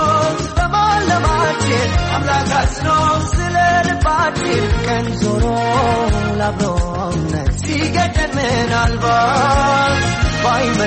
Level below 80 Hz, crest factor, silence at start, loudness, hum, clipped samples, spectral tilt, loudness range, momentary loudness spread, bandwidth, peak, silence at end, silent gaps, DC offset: -24 dBFS; 10 dB; 0 s; -16 LUFS; none; under 0.1%; -5 dB/octave; 2 LU; 5 LU; 8.8 kHz; -4 dBFS; 0 s; none; under 0.1%